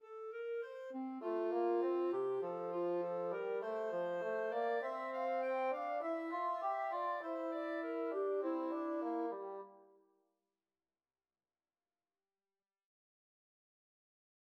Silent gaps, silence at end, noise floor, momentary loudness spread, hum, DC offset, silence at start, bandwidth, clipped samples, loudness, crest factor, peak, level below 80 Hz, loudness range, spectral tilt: none; 4.7 s; under -90 dBFS; 7 LU; none; under 0.1%; 0 s; 7 kHz; under 0.1%; -40 LUFS; 14 dB; -26 dBFS; under -90 dBFS; 6 LU; -7 dB/octave